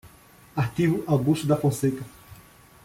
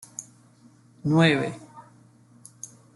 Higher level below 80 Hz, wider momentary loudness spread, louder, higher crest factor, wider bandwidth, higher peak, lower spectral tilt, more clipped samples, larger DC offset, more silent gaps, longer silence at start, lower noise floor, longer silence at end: first, -56 dBFS vs -64 dBFS; second, 12 LU vs 23 LU; about the same, -25 LUFS vs -23 LUFS; about the same, 16 dB vs 20 dB; first, 16.5 kHz vs 12 kHz; about the same, -10 dBFS vs -8 dBFS; first, -7 dB/octave vs -5.5 dB/octave; neither; neither; neither; second, 0.05 s vs 0.2 s; about the same, -52 dBFS vs -55 dBFS; second, 0.5 s vs 1.15 s